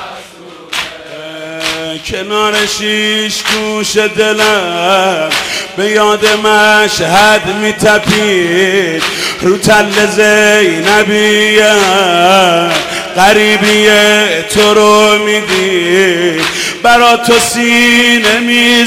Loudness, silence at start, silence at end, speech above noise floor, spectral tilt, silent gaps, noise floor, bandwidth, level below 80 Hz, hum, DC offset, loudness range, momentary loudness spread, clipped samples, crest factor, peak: -8 LUFS; 0 s; 0 s; 23 dB; -2.5 dB/octave; none; -32 dBFS; 16.5 kHz; -42 dBFS; none; under 0.1%; 4 LU; 9 LU; under 0.1%; 10 dB; 0 dBFS